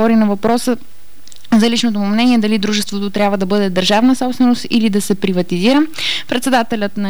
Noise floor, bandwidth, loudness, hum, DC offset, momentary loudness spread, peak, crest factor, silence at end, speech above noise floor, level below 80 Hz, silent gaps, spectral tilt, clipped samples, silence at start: -41 dBFS; over 20 kHz; -15 LUFS; none; 6%; 5 LU; -4 dBFS; 10 dB; 0 s; 26 dB; -52 dBFS; none; -5 dB/octave; under 0.1%; 0 s